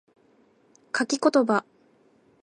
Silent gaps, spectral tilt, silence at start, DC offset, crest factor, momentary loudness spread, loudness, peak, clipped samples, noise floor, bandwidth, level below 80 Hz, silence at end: none; -3.5 dB/octave; 0.95 s; under 0.1%; 20 dB; 8 LU; -24 LUFS; -8 dBFS; under 0.1%; -61 dBFS; 11 kHz; -80 dBFS; 0.8 s